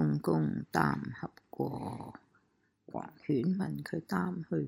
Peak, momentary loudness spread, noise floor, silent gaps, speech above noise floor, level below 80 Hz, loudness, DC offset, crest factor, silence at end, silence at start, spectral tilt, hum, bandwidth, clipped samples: -12 dBFS; 14 LU; -74 dBFS; none; 40 dB; -66 dBFS; -35 LUFS; under 0.1%; 22 dB; 0 s; 0 s; -8 dB/octave; none; 16 kHz; under 0.1%